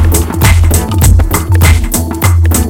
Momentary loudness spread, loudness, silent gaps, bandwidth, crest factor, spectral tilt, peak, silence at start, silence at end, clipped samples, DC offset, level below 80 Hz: 3 LU; -9 LUFS; none; 17.5 kHz; 8 dB; -5 dB/octave; 0 dBFS; 0 s; 0 s; 2%; under 0.1%; -12 dBFS